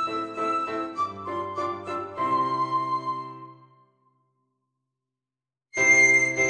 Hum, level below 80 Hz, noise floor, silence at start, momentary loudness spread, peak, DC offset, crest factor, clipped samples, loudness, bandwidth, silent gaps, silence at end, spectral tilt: none; -68 dBFS; under -90 dBFS; 0 s; 17 LU; -8 dBFS; under 0.1%; 18 dB; under 0.1%; -23 LUFS; 9.8 kHz; none; 0 s; -3 dB/octave